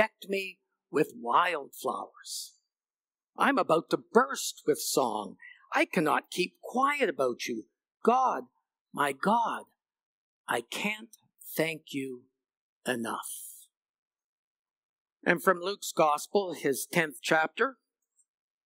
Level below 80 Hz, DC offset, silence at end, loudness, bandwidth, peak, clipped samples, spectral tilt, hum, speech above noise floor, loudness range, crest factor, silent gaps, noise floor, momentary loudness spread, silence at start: under -90 dBFS; under 0.1%; 0.95 s; -30 LUFS; 16 kHz; -8 dBFS; under 0.1%; -3.5 dB/octave; none; over 61 dB; 7 LU; 24 dB; 8.81-8.86 s, 10.05-10.44 s, 12.57-12.81 s, 13.77-13.81 s, 13.89-14.11 s, 14.24-14.65 s, 14.71-15.05 s, 15.12-15.16 s; under -90 dBFS; 13 LU; 0 s